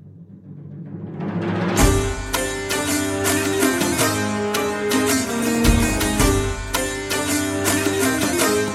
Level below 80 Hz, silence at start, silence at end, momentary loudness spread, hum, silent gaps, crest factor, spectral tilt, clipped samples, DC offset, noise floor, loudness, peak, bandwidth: -30 dBFS; 0 s; 0 s; 8 LU; none; none; 18 dB; -4 dB/octave; under 0.1%; under 0.1%; -41 dBFS; -20 LUFS; -2 dBFS; 16.5 kHz